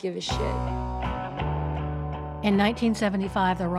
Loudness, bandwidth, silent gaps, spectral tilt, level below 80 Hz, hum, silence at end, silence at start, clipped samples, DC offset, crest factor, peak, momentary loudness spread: -27 LUFS; 12.5 kHz; none; -6 dB/octave; -36 dBFS; none; 0 s; 0 s; under 0.1%; under 0.1%; 16 dB; -10 dBFS; 8 LU